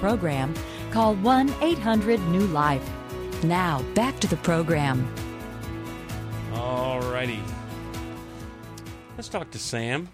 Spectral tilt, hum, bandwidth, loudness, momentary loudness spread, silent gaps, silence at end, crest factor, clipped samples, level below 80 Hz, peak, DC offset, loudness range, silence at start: -6 dB/octave; none; 15.5 kHz; -26 LUFS; 14 LU; none; 0 s; 16 dB; under 0.1%; -42 dBFS; -10 dBFS; under 0.1%; 8 LU; 0 s